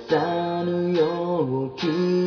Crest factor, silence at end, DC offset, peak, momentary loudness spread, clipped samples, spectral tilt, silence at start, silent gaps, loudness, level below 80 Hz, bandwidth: 14 dB; 0 s; under 0.1%; -8 dBFS; 3 LU; under 0.1%; -7.5 dB/octave; 0 s; none; -24 LUFS; -64 dBFS; 5.4 kHz